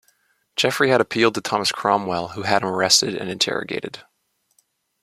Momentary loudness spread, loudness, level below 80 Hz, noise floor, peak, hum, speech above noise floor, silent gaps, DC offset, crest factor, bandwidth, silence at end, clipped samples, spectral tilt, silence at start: 13 LU; -20 LUFS; -62 dBFS; -66 dBFS; -2 dBFS; none; 45 dB; none; under 0.1%; 20 dB; 16 kHz; 1 s; under 0.1%; -2.5 dB/octave; 0.55 s